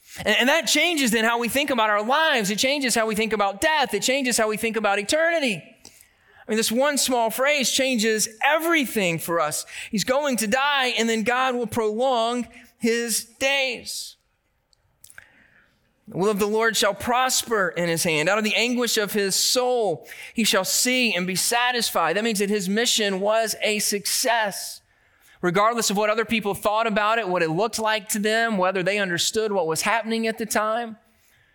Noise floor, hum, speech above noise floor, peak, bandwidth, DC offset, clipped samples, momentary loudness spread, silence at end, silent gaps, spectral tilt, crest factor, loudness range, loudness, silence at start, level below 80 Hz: -69 dBFS; none; 47 dB; -6 dBFS; 19 kHz; under 0.1%; under 0.1%; 6 LU; 0.6 s; none; -2.5 dB/octave; 16 dB; 4 LU; -21 LUFS; 0.1 s; -62 dBFS